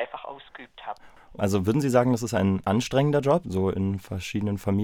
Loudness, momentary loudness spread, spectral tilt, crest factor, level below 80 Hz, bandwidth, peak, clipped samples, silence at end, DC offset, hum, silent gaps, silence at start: -25 LUFS; 18 LU; -6.5 dB/octave; 18 dB; -56 dBFS; 17.5 kHz; -8 dBFS; under 0.1%; 0 s; under 0.1%; none; none; 0 s